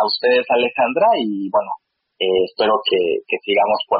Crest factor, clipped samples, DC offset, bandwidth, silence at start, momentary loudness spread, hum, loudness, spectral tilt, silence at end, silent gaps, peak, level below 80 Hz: 12 dB; under 0.1%; under 0.1%; 5 kHz; 0 s; 6 LU; none; -18 LUFS; -1 dB/octave; 0 s; none; -6 dBFS; -64 dBFS